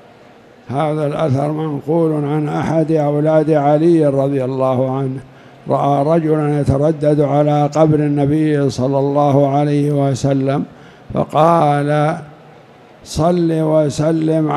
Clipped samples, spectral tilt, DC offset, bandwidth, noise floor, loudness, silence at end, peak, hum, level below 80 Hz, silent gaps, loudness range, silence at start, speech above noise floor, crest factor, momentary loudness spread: under 0.1%; -8 dB/octave; under 0.1%; 11.5 kHz; -43 dBFS; -15 LUFS; 0 s; 0 dBFS; none; -46 dBFS; none; 3 LU; 0.7 s; 29 dB; 14 dB; 7 LU